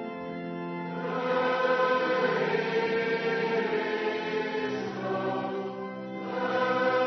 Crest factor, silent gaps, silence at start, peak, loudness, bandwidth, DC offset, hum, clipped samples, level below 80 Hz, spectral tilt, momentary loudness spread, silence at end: 14 dB; none; 0 s; -14 dBFS; -29 LUFS; 6.4 kHz; under 0.1%; none; under 0.1%; -74 dBFS; -6 dB/octave; 10 LU; 0 s